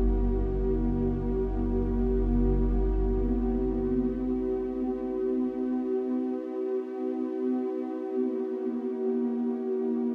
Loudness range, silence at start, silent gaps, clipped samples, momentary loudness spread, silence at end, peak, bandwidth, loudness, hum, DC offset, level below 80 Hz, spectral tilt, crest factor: 2 LU; 0 s; none; under 0.1%; 4 LU; 0 s; -14 dBFS; 3.5 kHz; -29 LUFS; none; under 0.1%; -32 dBFS; -11 dB/octave; 12 dB